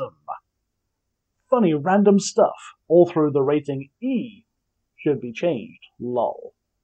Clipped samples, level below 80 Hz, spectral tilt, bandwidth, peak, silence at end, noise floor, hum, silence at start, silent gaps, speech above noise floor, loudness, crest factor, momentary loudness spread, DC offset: under 0.1%; -70 dBFS; -6.5 dB/octave; 9 kHz; -4 dBFS; 0.35 s; -77 dBFS; none; 0 s; none; 57 dB; -21 LUFS; 18 dB; 20 LU; under 0.1%